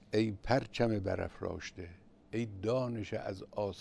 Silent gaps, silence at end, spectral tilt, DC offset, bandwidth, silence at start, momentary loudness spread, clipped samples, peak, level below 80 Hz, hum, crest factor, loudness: none; 0 s; -6.5 dB/octave; under 0.1%; 11 kHz; 0.1 s; 11 LU; under 0.1%; -16 dBFS; -56 dBFS; none; 20 dB; -36 LUFS